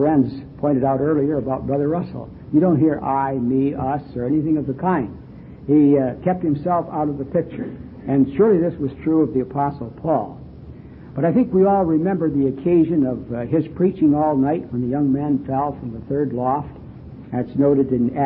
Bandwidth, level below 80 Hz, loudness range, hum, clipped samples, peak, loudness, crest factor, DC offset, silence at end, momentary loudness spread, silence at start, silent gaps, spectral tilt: 4.6 kHz; -46 dBFS; 2 LU; none; under 0.1%; -6 dBFS; -20 LUFS; 14 dB; under 0.1%; 0 s; 15 LU; 0 s; none; -13.5 dB/octave